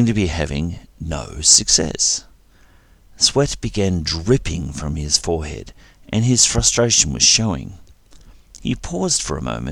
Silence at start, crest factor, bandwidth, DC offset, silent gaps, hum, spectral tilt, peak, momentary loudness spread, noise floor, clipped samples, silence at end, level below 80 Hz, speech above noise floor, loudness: 0 s; 20 dB; 15.5 kHz; under 0.1%; none; none; -3 dB/octave; 0 dBFS; 16 LU; -50 dBFS; under 0.1%; 0 s; -34 dBFS; 31 dB; -17 LUFS